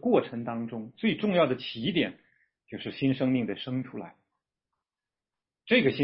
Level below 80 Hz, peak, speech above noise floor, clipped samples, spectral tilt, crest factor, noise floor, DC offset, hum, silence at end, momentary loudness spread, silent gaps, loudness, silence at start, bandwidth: -68 dBFS; -8 dBFS; over 62 dB; under 0.1%; -10 dB/octave; 20 dB; under -90 dBFS; under 0.1%; none; 0 s; 14 LU; none; -29 LUFS; 0 s; 5.8 kHz